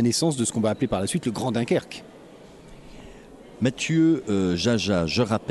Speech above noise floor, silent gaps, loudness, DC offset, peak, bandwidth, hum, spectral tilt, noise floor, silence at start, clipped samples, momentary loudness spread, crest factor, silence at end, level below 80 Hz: 23 dB; none; -24 LUFS; under 0.1%; -8 dBFS; 12 kHz; none; -5 dB/octave; -46 dBFS; 0 s; under 0.1%; 5 LU; 16 dB; 0 s; -52 dBFS